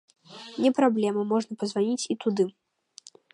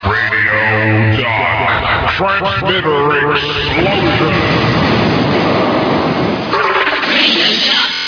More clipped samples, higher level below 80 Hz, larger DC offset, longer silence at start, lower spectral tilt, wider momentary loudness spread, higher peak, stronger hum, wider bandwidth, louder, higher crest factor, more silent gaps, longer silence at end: neither; second, -78 dBFS vs -34 dBFS; neither; first, 0.3 s vs 0 s; about the same, -5 dB/octave vs -5.5 dB/octave; first, 8 LU vs 4 LU; second, -8 dBFS vs 0 dBFS; neither; first, 11 kHz vs 5.4 kHz; second, -26 LUFS vs -12 LUFS; first, 18 dB vs 12 dB; neither; first, 0.85 s vs 0 s